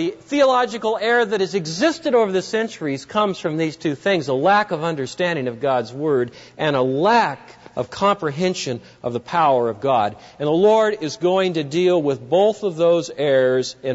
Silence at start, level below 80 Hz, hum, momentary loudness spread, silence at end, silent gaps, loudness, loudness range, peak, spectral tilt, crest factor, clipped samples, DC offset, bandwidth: 0 s; -62 dBFS; none; 8 LU; 0 s; none; -20 LUFS; 2 LU; -6 dBFS; -5 dB/octave; 14 dB; under 0.1%; under 0.1%; 8 kHz